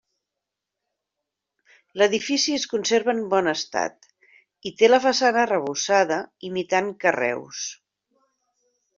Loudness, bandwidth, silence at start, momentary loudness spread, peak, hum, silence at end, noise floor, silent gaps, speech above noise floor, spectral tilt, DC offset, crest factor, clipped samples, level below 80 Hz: -22 LUFS; 7.6 kHz; 1.95 s; 13 LU; -4 dBFS; none; 1.25 s; -85 dBFS; none; 63 dB; -2.5 dB/octave; under 0.1%; 20 dB; under 0.1%; -70 dBFS